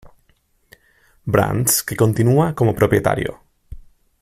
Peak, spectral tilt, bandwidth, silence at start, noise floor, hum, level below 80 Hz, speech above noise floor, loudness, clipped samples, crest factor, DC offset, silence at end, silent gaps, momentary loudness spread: -2 dBFS; -5.5 dB/octave; 16 kHz; 0.05 s; -60 dBFS; none; -44 dBFS; 44 dB; -17 LUFS; under 0.1%; 18 dB; under 0.1%; 0.4 s; none; 7 LU